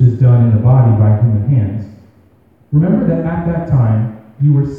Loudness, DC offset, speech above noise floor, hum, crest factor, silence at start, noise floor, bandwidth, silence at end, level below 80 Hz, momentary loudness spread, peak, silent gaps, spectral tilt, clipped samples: -13 LUFS; 0.1%; 36 dB; none; 12 dB; 0 s; -49 dBFS; 2.7 kHz; 0 s; -36 dBFS; 9 LU; 0 dBFS; none; -12 dB/octave; under 0.1%